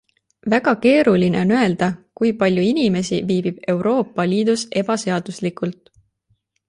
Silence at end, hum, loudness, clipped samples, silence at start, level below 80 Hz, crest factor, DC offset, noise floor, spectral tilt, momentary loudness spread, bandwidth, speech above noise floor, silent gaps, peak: 0.95 s; none; -19 LUFS; under 0.1%; 0.45 s; -56 dBFS; 16 dB; under 0.1%; -66 dBFS; -6 dB/octave; 9 LU; 11 kHz; 48 dB; none; -4 dBFS